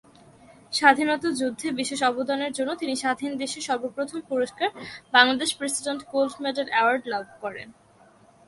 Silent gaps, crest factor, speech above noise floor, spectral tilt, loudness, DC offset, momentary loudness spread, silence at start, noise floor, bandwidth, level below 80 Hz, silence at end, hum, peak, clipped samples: none; 24 dB; 30 dB; -2 dB/octave; -24 LUFS; under 0.1%; 12 LU; 0.7 s; -55 dBFS; 12 kHz; -68 dBFS; 0.75 s; none; -2 dBFS; under 0.1%